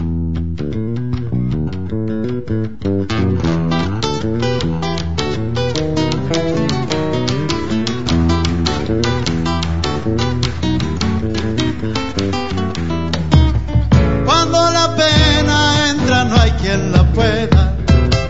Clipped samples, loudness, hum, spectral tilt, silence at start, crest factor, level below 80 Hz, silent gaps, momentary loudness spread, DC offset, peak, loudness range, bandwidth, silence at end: under 0.1%; -16 LUFS; none; -5.5 dB/octave; 0 s; 16 dB; -24 dBFS; none; 8 LU; 4%; 0 dBFS; 6 LU; 8 kHz; 0 s